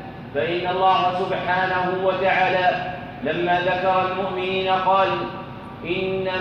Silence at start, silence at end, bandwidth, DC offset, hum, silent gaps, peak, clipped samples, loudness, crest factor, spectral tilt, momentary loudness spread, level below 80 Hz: 0 s; 0 s; 6.8 kHz; under 0.1%; none; none; -6 dBFS; under 0.1%; -21 LUFS; 16 dB; -6.5 dB/octave; 11 LU; -52 dBFS